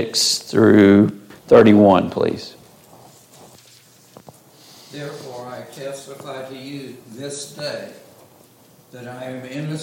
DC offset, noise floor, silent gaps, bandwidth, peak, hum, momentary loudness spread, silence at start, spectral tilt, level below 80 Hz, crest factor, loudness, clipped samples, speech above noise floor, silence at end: under 0.1%; -50 dBFS; none; 16.5 kHz; -2 dBFS; none; 24 LU; 0 s; -5 dB/octave; -58 dBFS; 18 dB; -15 LUFS; under 0.1%; 33 dB; 0 s